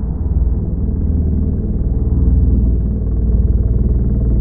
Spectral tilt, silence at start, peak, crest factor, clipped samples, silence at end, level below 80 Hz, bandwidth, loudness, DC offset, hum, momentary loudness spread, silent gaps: -16.5 dB/octave; 0 s; -2 dBFS; 10 dB; under 0.1%; 0 s; -16 dBFS; 1.6 kHz; -17 LUFS; under 0.1%; none; 5 LU; none